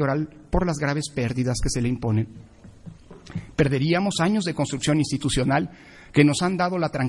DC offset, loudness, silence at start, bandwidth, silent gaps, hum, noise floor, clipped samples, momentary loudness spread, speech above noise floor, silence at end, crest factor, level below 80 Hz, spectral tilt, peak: under 0.1%; -23 LUFS; 0 s; 11.5 kHz; none; none; -44 dBFS; under 0.1%; 8 LU; 21 dB; 0 s; 20 dB; -40 dBFS; -5.5 dB/octave; -2 dBFS